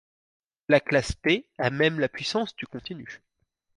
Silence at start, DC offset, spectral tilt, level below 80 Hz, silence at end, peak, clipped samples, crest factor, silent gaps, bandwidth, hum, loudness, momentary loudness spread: 0.7 s; under 0.1%; -5 dB/octave; -50 dBFS; 0.6 s; -6 dBFS; under 0.1%; 22 dB; none; 11.5 kHz; none; -25 LUFS; 17 LU